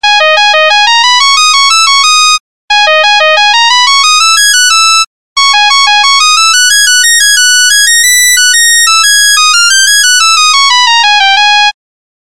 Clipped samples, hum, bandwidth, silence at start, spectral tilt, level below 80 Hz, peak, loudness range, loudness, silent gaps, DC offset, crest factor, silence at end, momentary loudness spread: under 0.1%; none; 16 kHz; 0 s; 6 dB/octave; -50 dBFS; 0 dBFS; 1 LU; -3 LUFS; 2.40-2.68 s, 5.07-5.36 s; 4%; 6 dB; 0.55 s; 2 LU